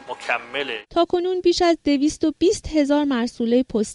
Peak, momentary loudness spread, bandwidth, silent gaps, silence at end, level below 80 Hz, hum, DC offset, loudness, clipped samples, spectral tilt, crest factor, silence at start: -6 dBFS; 6 LU; 11.5 kHz; none; 0 s; -46 dBFS; none; under 0.1%; -21 LUFS; under 0.1%; -4 dB/octave; 14 dB; 0 s